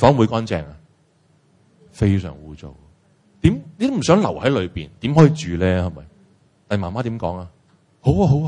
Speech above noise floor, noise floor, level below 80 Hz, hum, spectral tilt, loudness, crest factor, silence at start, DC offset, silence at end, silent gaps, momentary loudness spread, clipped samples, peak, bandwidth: 40 dB; -58 dBFS; -42 dBFS; none; -7 dB/octave; -19 LUFS; 20 dB; 0 s; under 0.1%; 0 s; none; 20 LU; under 0.1%; 0 dBFS; 10 kHz